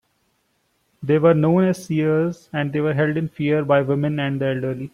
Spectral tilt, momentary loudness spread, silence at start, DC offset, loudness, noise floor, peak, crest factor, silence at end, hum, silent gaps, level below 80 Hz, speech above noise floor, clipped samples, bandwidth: -8 dB/octave; 8 LU; 1 s; under 0.1%; -20 LUFS; -67 dBFS; -4 dBFS; 16 dB; 0.05 s; none; none; -60 dBFS; 48 dB; under 0.1%; 12.5 kHz